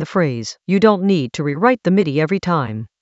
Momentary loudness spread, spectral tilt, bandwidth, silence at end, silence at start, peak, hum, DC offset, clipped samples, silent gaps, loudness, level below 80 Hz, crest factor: 7 LU; -7 dB/octave; 8 kHz; 0.15 s; 0 s; 0 dBFS; none; under 0.1%; under 0.1%; none; -17 LUFS; -56 dBFS; 16 dB